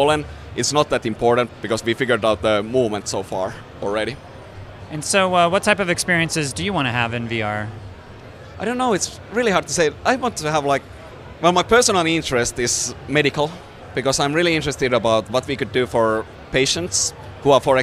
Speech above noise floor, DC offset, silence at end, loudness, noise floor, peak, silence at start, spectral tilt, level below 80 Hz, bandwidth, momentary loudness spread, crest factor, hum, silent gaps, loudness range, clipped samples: 20 dB; under 0.1%; 0 s; -19 LUFS; -39 dBFS; -2 dBFS; 0 s; -3.5 dB/octave; -44 dBFS; 15.5 kHz; 14 LU; 18 dB; none; none; 4 LU; under 0.1%